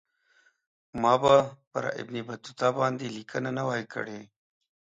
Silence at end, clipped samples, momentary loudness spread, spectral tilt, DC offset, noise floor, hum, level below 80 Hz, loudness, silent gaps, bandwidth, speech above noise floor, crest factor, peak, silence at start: 0.7 s; under 0.1%; 16 LU; -5.5 dB/octave; under 0.1%; -66 dBFS; none; -66 dBFS; -28 LUFS; 1.67-1.71 s; 7.8 kHz; 39 dB; 22 dB; -8 dBFS; 0.95 s